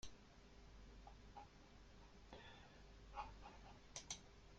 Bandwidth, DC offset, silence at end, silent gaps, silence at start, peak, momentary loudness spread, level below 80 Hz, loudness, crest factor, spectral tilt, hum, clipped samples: 16 kHz; under 0.1%; 0 s; none; 0 s; -34 dBFS; 12 LU; -66 dBFS; -60 LUFS; 26 dB; -2.5 dB/octave; none; under 0.1%